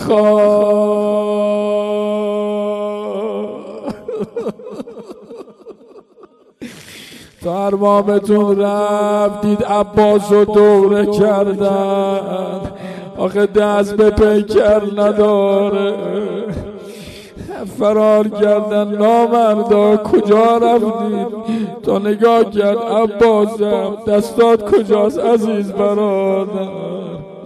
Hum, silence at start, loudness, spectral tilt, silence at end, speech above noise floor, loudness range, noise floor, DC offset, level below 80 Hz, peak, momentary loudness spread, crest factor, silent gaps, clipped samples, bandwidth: none; 0 s; -14 LUFS; -7 dB/octave; 0 s; 32 dB; 11 LU; -45 dBFS; under 0.1%; -44 dBFS; -2 dBFS; 16 LU; 12 dB; none; under 0.1%; 13 kHz